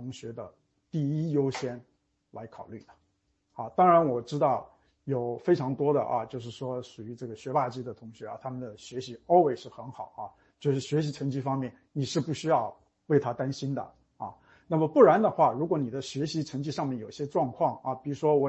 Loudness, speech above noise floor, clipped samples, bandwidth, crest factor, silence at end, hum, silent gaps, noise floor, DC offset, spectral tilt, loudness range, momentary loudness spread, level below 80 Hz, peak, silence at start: -28 LUFS; 46 dB; under 0.1%; 8.4 kHz; 22 dB; 0 s; none; none; -74 dBFS; under 0.1%; -7 dB/octave; 6 LU; 20 LU; -70 dBFS; -8 dBFS; 0 s